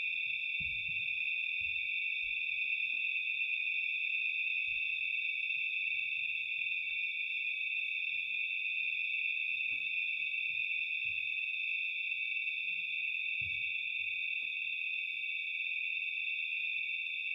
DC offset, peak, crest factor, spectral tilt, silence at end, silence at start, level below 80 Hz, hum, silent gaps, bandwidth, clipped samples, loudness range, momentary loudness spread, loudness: under 0.1%; -24 dBFS; 12 dB; -0.5 dB/octave; 0 s; 0 s; -74 dBFS; none; none; 15.5 kHz; under 0.1%; 2 LU; 2 LU; -33 LUFS